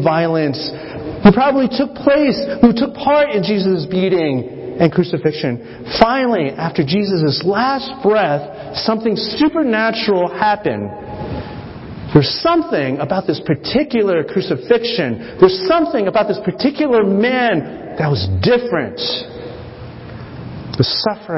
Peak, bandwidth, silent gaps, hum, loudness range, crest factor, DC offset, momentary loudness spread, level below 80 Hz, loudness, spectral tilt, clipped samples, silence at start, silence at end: 0 dBFS; 5.8 kHz; none; none; 3 LU; 16 dB; under 0.1%; 14 LU; -40 dBFS; -16 LUFS; -9 dB/octave; under 0.1%; 0 s; 0 s